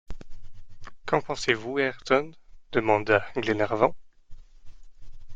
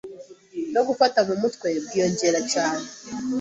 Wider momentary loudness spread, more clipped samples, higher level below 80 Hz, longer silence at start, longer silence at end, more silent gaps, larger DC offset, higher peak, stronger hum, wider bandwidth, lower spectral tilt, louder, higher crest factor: about the same, 16 LU vs 14 LU; neither; first, -48 dBFS vs -64 dBFS; about the same, 0.1 s vs 0.05 s; about the same, 0 s vs 0 s; neither; neither; about the same, -6 dBFS vs -4 dBFS; neither; first, 9.2 kHz vs 8.2 kHz; first, -5 dB/octave vs -3.5 dB/octave; second, -26 LUFS vs -23 LUFS; about the same, 22 dB vs 20 dB